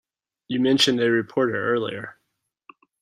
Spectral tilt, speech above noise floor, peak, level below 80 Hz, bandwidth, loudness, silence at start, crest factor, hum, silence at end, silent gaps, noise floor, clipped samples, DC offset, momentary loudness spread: -4 dB/octave; 56 dB; -6 dBFS; -66 dBFS; 14.5 kHz; -22 LUFS; 0.5 s; 18 dB; none; 0.9 s; none; -77 dBFS; under 0.1%; under 0.1%; 14 LU